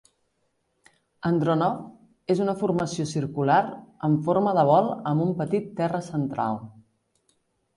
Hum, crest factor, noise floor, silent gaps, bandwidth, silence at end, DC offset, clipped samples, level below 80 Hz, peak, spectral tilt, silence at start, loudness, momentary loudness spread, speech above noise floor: none; 18 dB; -73 dBFS; none; 11.5 kHz; 1.05 s; under 0.1%; under 0.1%; -64 dBFS; -8 dBFS; -7.5 dB/octave; 1.25 s; -25 LUFS; 9 LU; 49 dB